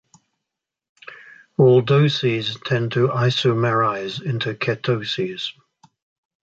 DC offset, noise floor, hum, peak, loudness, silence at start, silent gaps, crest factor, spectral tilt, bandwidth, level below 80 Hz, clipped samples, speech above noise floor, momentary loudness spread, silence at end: under 0.1%; -84 dBFS; none; -4 dBFS; -20 LUFS; 1.05 s; none; 16 dB; -6.5 dB/octave; 7.8 kHz; -60 dBFS; under 0.1%; 64 dB; 13 LU; 0.9 s